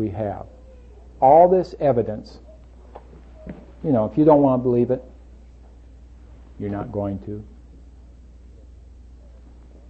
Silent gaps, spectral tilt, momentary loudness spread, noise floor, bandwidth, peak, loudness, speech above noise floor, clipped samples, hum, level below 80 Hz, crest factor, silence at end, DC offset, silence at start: none; -10.5 dB/octave; 26 LU; -45 dBFS; 7.6 kHz; -2 dBFS; -19 LUFS; 26 dB; under 0.1%; none; -44 dBFS; 20 dB; 0.9 s; under 0.1%; 0 s